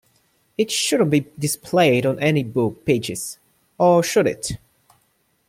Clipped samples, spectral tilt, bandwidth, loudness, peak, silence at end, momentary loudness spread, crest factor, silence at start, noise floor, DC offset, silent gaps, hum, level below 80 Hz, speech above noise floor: under 0.1%; -4.5 dB/octave; 16.5 kHz; -20 LUFS; -4 dBFS; 0.95 s; 13 LU; 16 dB; 0.6 s; -65 dBFS; under 0.1%; none; none; -54 dBFS; 46 dB